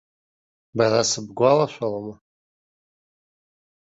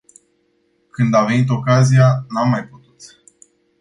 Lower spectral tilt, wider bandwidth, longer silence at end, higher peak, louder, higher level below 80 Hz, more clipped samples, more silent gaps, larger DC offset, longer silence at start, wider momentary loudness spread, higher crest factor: second, -4 dB/octave vs -7 dB/octave; second, 8 kHz vs 10.5 kHz; first, 1.85 s vs 0.75 s; second, -6 dBFS vs -2 dBFS; second, -21 LUFS vs -15 LUFS; second, -64 dBFS vs -56 dBFS; neither; neither; neither; second, 0.75 s vs 1 s; first, 15 LU vs 9 LU; about the same, 20 dB vs 16 dB